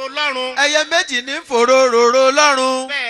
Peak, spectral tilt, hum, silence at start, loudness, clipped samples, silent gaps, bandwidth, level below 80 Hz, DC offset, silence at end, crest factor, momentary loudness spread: 0 dBFS; 0 dB/octave; none; 0 s; -14 LUFS; under 0.1%; none; 13 kHz; -64 dBFS; under 0.1%; 0 s; 14 dB; 8 LU